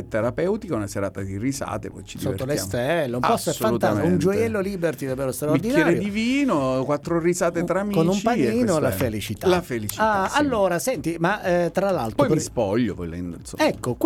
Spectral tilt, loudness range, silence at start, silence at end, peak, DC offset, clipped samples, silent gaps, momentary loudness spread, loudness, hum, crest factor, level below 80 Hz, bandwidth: -5.5 dB/octave; 2 LU; 0 s; 0 s; -6 dBFS; under 0.1%; under 0.1%; none; 7 LU; -23 LUFS; none; 16 dB; -48 dBFS; 18.5 kHz